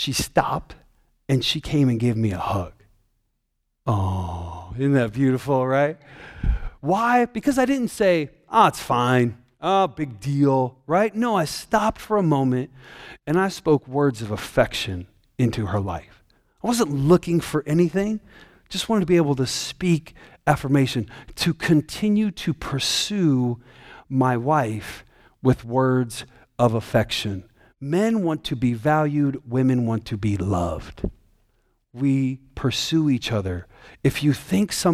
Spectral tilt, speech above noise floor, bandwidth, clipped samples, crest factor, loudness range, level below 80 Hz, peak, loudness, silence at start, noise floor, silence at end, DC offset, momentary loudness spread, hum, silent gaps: -6 dB/octave; 52 dB; 15.5 kHz; under 0.1%; 20 dB; 4 LU; -42 dBFS; -2 dBFS; -22 LUFS; 0 s; -74 dBFS; 0 s; under 0.1%; 11 LU; none; none